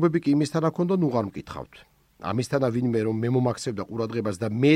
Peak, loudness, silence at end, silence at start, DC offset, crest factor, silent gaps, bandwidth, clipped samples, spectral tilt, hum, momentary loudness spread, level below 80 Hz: -6 dBFS; -25 LUFS; 0 s; 0 s; under 0.1%; 18 dB; none; 14 kHz; under 0.1%; -7 dB/octave; none; 13 LU; -58 dBFS